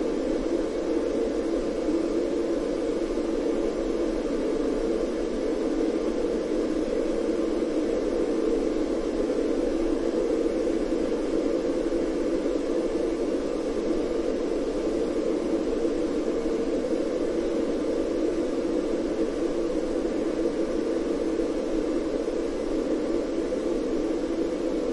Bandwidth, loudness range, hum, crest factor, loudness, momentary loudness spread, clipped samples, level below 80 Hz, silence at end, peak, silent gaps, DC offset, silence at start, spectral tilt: 11.5 kHz; 1 LU; none; 14 dB; -27 LUFS; 2 LU; under 0.1%; -42 dBFS; 0 s; -12 dBFS; none; under 0.1%; 0 s; -6 dB/octave